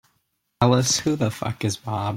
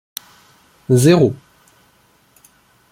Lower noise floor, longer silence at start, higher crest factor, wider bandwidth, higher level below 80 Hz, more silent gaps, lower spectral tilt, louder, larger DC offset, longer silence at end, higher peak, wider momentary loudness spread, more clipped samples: first, -72 dBFS vs -55 dBFS; second, 0.6 s vs 0.9 s; about the same, 20 dB vs 18 dB; about the same, 16 kHz vs 16.5 kHz; about the same, -54 dBFS vs -56 dBFS; neither; second, -4.5 dB/octave vs -6.5 dB/octave; second, -22 LUFS vs -14 LUFS; neither; second, 0 s vs 1.55 s; about the same, -2 dBFS vs -2 dBFS; second, 8 LU vs 24 LU; neither